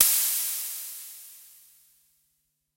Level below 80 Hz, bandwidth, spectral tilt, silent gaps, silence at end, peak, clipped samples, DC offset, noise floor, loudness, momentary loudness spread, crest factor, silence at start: -74 dBFS; 16 kHz; 4 dB/octave; none; 1.35 s; -2 dBFS; under 0.1%; under 0.1%; -75 dBFS; -25 LUFS; 24 LU; 28 dB; 0 s